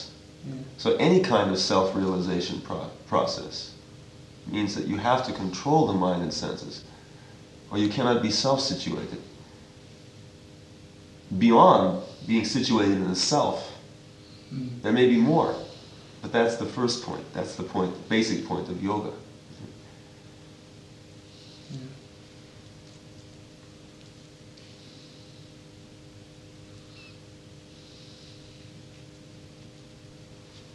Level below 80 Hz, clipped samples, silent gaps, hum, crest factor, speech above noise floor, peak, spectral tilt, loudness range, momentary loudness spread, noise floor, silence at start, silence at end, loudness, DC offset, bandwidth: -60 dBFS; under 0.1%; none; none; 24 dB; 25 dB; -4 dBFS; -5 dB/octave; 25 LU; 27 LU; -49 dBFS; 0 s; 0.1 s; -25 LUFS; under 0.1%; 10.5 kHz